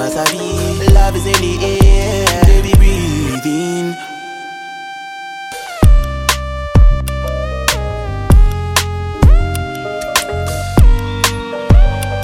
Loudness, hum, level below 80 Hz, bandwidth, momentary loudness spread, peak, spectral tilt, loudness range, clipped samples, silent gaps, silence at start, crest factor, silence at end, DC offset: -14 LUFS; none; -14 dBFS; 16.5 kHz; 14 LU; 0 dBFS; -5 dB/octave; 5 LU; under 0.1%; none; 0 s; 12 dB; 0 s; under 0.1%